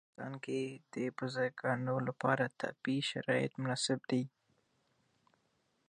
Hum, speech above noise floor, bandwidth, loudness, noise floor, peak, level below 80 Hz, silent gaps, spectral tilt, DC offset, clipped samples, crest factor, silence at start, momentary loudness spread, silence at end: none; 42 dB; 10 kHz; -37 LUFS; -78 dBFS; -16 dBFS; -82 dBFS; none; -5 dB/octave; under 0.1%; under 0.1%; 22 dB; 0.2 s; 7 LU; 1.6 s